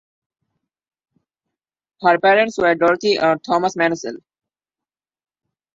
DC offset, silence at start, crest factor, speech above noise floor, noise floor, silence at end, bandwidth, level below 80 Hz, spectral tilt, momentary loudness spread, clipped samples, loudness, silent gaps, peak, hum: under 0.1%; 2 s; 20 dB; 73 dB; -90 dBFS; 1.55 s; 7.8 kHz; -62 dBFS; -4.5 dB/octave; 6 LU; under 0.1%; -17 LUFS; none; -2 dBFS; none